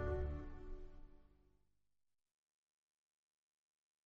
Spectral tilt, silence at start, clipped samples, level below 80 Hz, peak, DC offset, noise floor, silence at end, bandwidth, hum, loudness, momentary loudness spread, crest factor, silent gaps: -8.5 dB/octave; 0 s; under 0.1%; -52 dBFS; -30 dBFS; under 0.1%; under -90 dBFS; 2.8 s; 5 kHz; 50 Hz at -85 dBFS; -49 LUFS; 23 LU; 20 dB; none